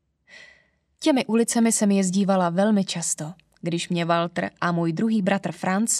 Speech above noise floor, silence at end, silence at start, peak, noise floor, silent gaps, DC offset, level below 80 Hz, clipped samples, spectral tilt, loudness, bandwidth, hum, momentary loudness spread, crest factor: 38 dB; 0 s; 0.35 s; -6 dBFS; -60 dBFS; none; under 0.1%; -70 dBFS; under 0.1%; -4.5 dB/octave; -23 LUFS; 13.5 kHz; none; 8 LU; 16 dB